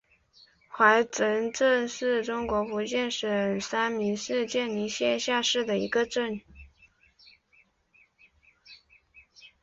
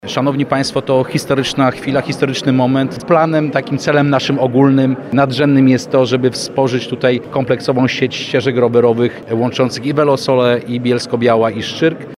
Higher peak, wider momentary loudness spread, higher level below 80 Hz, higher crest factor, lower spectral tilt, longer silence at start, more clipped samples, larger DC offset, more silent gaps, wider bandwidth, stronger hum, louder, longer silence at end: second, -6 dBFS vs 0 dBFS; about the same, 6 LU vs 5 LU; second, -60 dBFS vs -52 dBFS; first, 22 dB vs 14 dB; second, -3 dB/octave vs -6 dB/octave; first, 0.7 s vs 0.05 s; neither; neither; neither; second, 8 kHz vs 13 kHz; neither; second, -27 LUFS vs -14 LUFS; about the same, 0.15 s vs 0.05 s